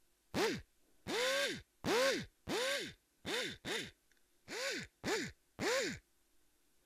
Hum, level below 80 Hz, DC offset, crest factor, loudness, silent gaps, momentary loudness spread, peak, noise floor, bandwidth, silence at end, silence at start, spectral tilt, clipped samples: none; -68 dBFS; under 0.1%; 22 dB; -38 LUFS; none; 13 LU; -18 dBFS; -73 dBFS; 15.5 kHz; 0.85 s; 0.35 s; -2.5 dB/octave; under 0.1%